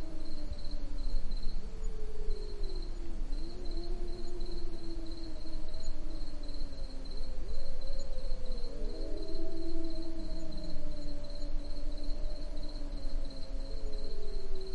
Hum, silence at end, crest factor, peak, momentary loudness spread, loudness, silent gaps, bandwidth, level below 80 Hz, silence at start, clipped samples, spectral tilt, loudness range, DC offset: none; 0 s; 12 dB; -18 dBFS; 3 LU; -44 LUFS; none; 4.8 kHz; -34 dBFS; 0 s; under 0.1%; -6 dB/octave; 2 LU; under 0.1%